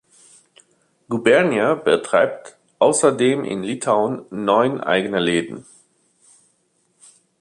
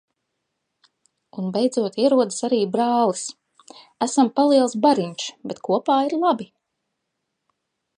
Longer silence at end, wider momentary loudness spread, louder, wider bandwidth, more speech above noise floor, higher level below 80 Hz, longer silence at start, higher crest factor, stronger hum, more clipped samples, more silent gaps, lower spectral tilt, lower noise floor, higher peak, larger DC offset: first, 1.8 s vs 1.5 s; second, 10 LU vs 13 LU; about the same, -19 LUFS vs -21 LUFS; about the same, 11.5 kHz vs 11 kHz; second, 47 dB vs 58 dB; first, -64 dBFS vs -76 dBFS; second, 1.1 s vs 1.35 s; about the same, 20 dB vs 18 dB; neither; neither; neither; about the same, -4 dB/octave vs -5 dB/octave; second, -65 dBFS vs -78 dBFS; about the same, -2 dBFS vs -4 dBFS; neither